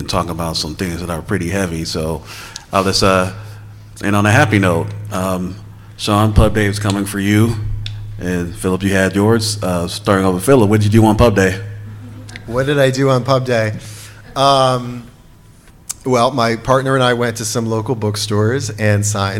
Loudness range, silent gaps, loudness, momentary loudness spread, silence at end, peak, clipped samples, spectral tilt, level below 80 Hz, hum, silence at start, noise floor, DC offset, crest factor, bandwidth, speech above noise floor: 4 LU; none; -15 LUFS; 16 LU; 0 s; 0 dBFS; under 0.1%; -5.5 dB/octave; -32 dBFS; none; 0 s; -43 dBFS; under 0.1%; 16 dB; 16.5 kHz; 28 dB